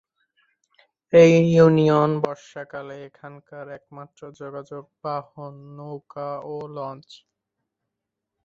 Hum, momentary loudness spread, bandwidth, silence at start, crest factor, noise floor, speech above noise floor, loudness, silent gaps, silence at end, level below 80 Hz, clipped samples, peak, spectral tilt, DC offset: none; 25 LU; 7.4 kHz; 1.15 s; 20 dB; -83 dBFS; 61 dB; -19 LUFS; none; 1.45 s; -62 dBFS; under 0.1%; -2 dBFS; -7.5 dB/octave; under 0.1%